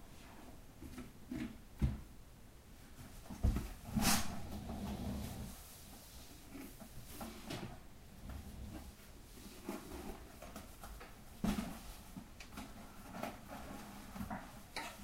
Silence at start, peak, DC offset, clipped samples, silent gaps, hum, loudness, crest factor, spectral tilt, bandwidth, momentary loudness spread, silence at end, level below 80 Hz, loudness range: 0 s; -20 dBFS; under 0.1%; under 0.1%; none; none; -45 LUFS; 24 dB; -4.5 dB/octave; 16 kHz; 17 LU; 0 s; -50 dBFS; 11 LU